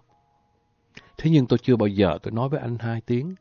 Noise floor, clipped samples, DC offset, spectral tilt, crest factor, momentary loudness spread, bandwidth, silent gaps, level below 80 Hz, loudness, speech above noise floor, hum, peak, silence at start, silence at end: -66 dBFS; under 0.1%; under 0.1%; -9 dB/octave; 16 dB; 8 LU; 7 kHz; none; -48 dBFS; -23 LUFS; 44 dB; none; -8 dBFS; 1.2 s; 0.05 s